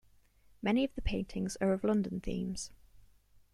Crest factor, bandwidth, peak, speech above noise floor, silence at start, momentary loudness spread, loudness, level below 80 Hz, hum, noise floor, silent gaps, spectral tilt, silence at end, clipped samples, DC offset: 16 dB; 12.5 kHz; -18 dBFS; 31 dB; 0.65 s; 8 LU; -34 LUFS; -46 dBFS; 50 Hz at -55 dBFS; -64 dBFS; none; -5.5 dB/octave; 0.55 s; under 0.1%; under 0.1%